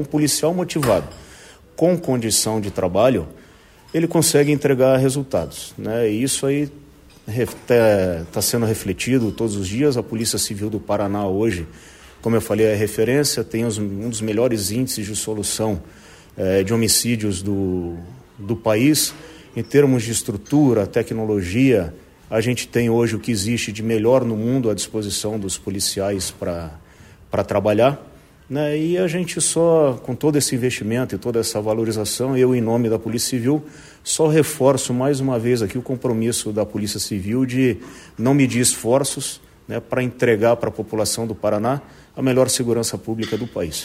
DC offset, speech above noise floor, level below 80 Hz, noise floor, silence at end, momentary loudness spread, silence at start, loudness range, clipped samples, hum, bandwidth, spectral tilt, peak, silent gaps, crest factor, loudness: under 0.1%; 28 dB; -48 dBFS; -47 dBFS; 0 s; 10 LU; 0 s; 3 LU; under 0.1%; none; 16 kHz; -4.5 dB/octave; -2 dBFS; none; 18 dB; -20 LUFS